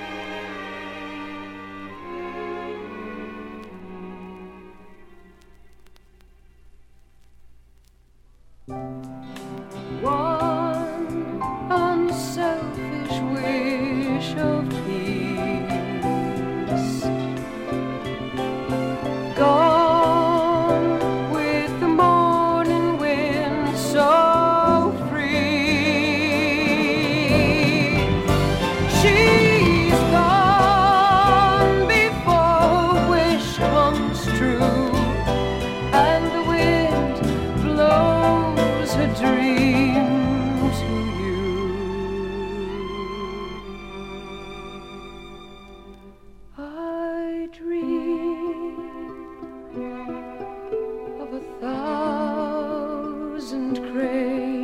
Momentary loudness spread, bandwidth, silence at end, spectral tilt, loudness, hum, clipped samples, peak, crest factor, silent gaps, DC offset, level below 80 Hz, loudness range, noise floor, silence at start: 19 LU; 16.5 kHz; 0 s; -6 dB/octave; -20 LUFS; none; under 0.1%; -4 dBFS; 18 dB; none; under 0.1%; -38 dBFS; 17 LU; -53 dBFS; 0 s